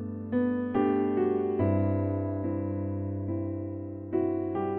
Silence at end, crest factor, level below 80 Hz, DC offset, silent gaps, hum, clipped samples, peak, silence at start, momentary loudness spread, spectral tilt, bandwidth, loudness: 0 s; 16 dB; -64 dBFS; under 0.1%; none; none; under 0.1%; -14 dBFS; 0 s; 7 LU; -9.5 dB/octave; 3.4 kHz; -30 LUFS